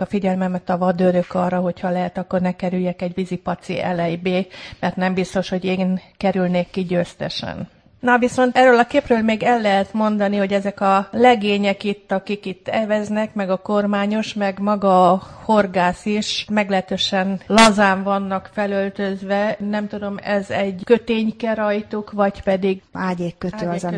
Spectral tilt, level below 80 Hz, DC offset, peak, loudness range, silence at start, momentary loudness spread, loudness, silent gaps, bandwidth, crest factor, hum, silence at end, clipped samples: -5.5 dB/octave; -52 dBFS; under 0.1%; 0 dBFS; 5 LU; 0 s; 10 LU; -19 LUFS; none; 10.5 kHz; 18 dB; none; 0 s; under 0.1%